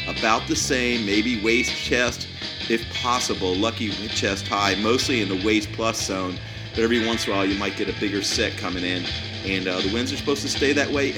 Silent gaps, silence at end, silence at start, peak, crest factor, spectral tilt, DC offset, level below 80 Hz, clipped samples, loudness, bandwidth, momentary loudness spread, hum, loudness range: none; 0 s; 0 s; -2 dBFS; 20 dB; -3.5 dB/octave; under 0.1%; -44 dBFS; under 0.1%; -23 LUFS; 18.5 kHz; 6 LU; none; 2 LU